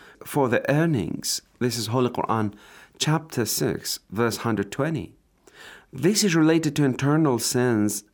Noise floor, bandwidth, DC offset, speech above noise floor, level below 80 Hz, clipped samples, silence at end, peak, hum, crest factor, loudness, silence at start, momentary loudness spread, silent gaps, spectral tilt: -49 dBFS; over 20 kHz; under 0.1%; 26 dB; -60 dBFS; under 0.1%; 0.1 s; -8 dBFS; none; 16 dB; -24 LUFS; 0.25 s; 8 LU; none; -5 dB/octave